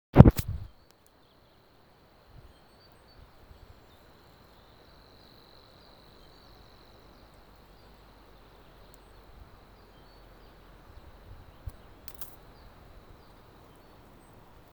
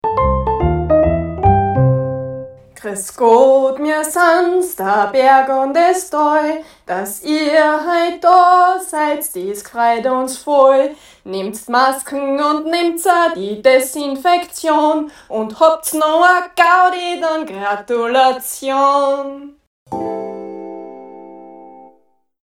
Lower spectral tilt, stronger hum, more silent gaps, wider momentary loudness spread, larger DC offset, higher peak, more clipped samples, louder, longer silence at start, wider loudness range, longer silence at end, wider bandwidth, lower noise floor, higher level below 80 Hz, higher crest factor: first, -8.5 dB/octave vs -5 dB/octave; neither; second, none vs 19.67-19.86 s; first, 23 LU vs 14 LU; neither; about the same, 0 dBFS vs 0 dBFS; neither; second, -23 LUFS vs -14 LUFS; about the same, 0.15 s vs 0.05 s; first, 8 LU vs 4 LU; first, 2.5 s vs 0.6 s; first, over 20 kHz vs 16.5 kHz; first, -61 dBFS vs -57 dBFS; about the same, -40 dBFS vs -36 dBFS; first, 32 dB vs 14 dB